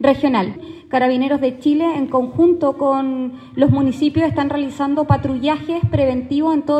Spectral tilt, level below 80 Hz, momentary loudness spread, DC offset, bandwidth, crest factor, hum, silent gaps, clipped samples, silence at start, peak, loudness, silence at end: -8 dB/octave; -44 dBFS; 6 LU; under 0.1%; 8.6 kHz; 16 dB; none; none; under 0.1%; 0 s; 0 dBFS; -18 LUFS; 0 s